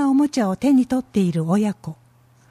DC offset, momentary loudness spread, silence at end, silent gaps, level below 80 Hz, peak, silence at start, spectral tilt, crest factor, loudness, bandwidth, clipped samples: under 0.1%; 9 LU; 0.55 s; none; -56 dBFS; -8 dBFS; 0 s; -7 dB/octave; 12 dB; -20 LUFS; 13.5 kHz; under 0.1%